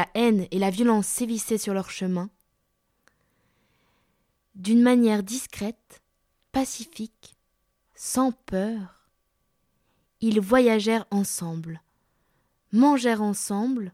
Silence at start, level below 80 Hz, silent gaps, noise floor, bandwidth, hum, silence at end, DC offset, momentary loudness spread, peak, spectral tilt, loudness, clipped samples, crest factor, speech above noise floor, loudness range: 0 s; -60 dBFS; none; -73 dBFS; 16 kHz; none; 0.05 s; under 0.1%; 16 LU; -6 dBFS; -5 dB/octave; -24 LUFS; under 0.1%; 20 dB; 49 dB; 8 LU